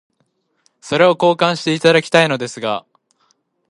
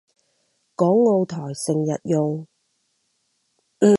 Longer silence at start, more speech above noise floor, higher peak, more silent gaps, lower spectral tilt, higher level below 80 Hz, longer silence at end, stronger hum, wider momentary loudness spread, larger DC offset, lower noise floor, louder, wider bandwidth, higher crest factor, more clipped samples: about the same, 0.85 s vs 0.8 s; about the same, 51 dB vs 50 dB; first, 0 dBFS vs -4 dBFS; neither; second, -4.5 dB/octave vs -7 dB/octave; about the same, -64 dBFS vs -68 dBFS; first, 0.9 s vs 0 s; neither; about the same, 10 LU vs 10 LU; neither; second, -66 dBFS vs -70 dBFS; first, -15 LUFS vs -21 LUFS; about the same, 11.5 kHz vs 11.5 kHz; about the same, 18 dB vs 18 dB; neither